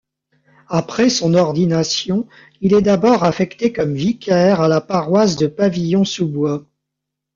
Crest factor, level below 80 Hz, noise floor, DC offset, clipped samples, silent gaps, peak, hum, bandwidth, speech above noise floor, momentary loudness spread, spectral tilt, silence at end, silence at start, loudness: 14 dB; -52 dBFS; -80 dBFS; under 0.1%; under 0.1%; none; -2 dBFS; none; 7.6 kHz; 64 dB; 8 LU; -6 dB/octave; 0.75 s; 0.7 s; -16 LUFS